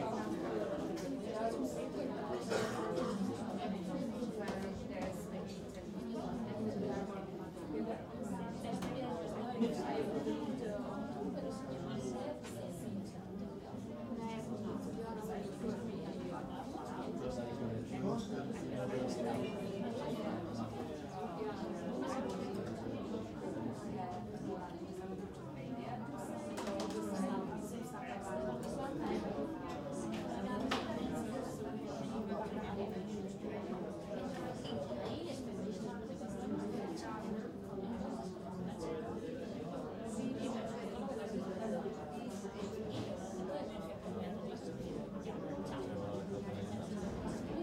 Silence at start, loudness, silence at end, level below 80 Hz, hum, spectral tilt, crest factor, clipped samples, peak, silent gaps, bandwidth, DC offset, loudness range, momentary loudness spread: 0 s; -42 LUFS; 0 s; -64 dBFS; none; -6.5 dB/octave; 18 dB; under 0.1%; -24 dBFS; none; 16 kHz; under 0.1%; 3 LU; 6 LU